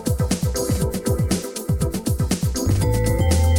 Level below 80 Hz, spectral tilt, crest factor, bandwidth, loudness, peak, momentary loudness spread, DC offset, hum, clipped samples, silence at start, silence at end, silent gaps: -26 dBFS; -5.5 dB/octave; 14 dB; 17.5 kHz; -22 LUFS; -6 dBFS; 4 LU; under 0.1%; none; under 0.1%; 0 s; 0 s; none